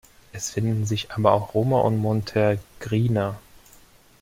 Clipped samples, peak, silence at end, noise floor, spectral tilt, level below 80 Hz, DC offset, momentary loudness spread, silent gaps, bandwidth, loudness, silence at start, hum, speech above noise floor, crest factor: under 0.1%; -2 dBFS; 0.8 s; -53 dBFS; -6.5 dB/octave; -52 dBFS; under 0.1%; 9 LU; none; 16 kHz; -23 LUFS; 0.35 s; none; 30 dB; 20 dB